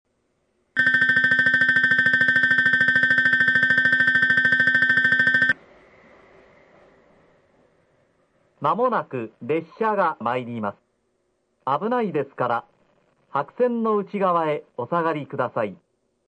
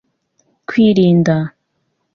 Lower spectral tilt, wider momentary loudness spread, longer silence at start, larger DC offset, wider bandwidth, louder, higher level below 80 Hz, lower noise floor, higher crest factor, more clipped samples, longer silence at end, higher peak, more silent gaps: second, -5.5 dB/octave vs -8 dB/octave; second, 12 LU vs 16 LU; about the same, 0.75 s vs 0.7 s; neither; first, 9.4 kHz vs 6.8 kHz; second, -20 LUFS vs -13 LUFS; second, -64 dBFS vs -52 dBFS; about the same, -70 dBFS vs -68 dBFS; about the same, 14 dB vs 14 dB; neither; about the same, 0.55 s vs 0.65 s; second, -8 dBFS vs -2 dBFS; neither